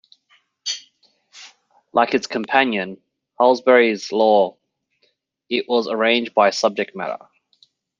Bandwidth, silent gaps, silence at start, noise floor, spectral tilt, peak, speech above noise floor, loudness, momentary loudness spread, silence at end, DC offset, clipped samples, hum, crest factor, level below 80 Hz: 7.6 kHz; none; 0.65 s; -66 dBFS; -3.5 dB/octave; 0 dBFS; 49 dB; -19 LUFS; 14 LU; 0.85 s; under 0.1%; under 0.1%; none; 20 dB; -72 dBFS